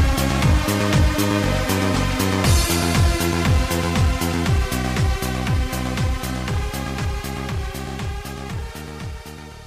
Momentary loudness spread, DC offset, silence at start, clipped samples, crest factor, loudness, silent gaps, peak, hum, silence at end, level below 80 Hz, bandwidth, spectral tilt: 12 LU; under 0.1%; 0 s; under 0.1%; 16 dB; -21 LUFS; none; -4 dBFS; none; 0 s; -26 dBFS; 15.5 kHz; -5 dB/octave